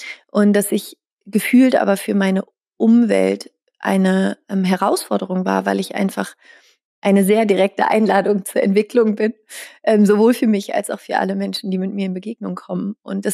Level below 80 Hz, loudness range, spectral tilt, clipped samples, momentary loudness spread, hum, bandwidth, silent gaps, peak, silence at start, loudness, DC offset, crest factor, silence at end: -74 dBFS; 3 LU; -6 dB/octave; under 0.1%; 12 LU; none; 15 kHz; 1.12-1.17 s, 6.84-7.02 s; -4 dBFS; 0 s; -17 LUFS; under 0.1%; 14 dB; 0 s